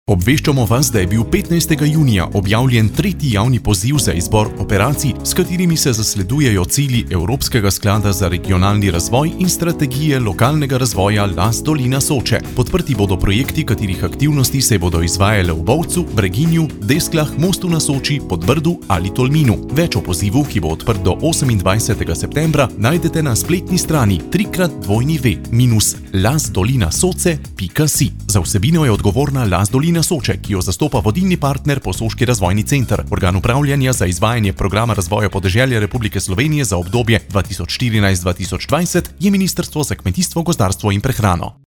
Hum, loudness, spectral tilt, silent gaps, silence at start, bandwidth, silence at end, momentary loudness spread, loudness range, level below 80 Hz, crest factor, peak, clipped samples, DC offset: none; -15 LUFS; -5 dB/octave; none; 0.1 s; 20 kHz; 0.15 s; 4 LU; 2 LU; -30 dBFS; 14 dB; 0 dBFS; under 0.1%; under 0.1%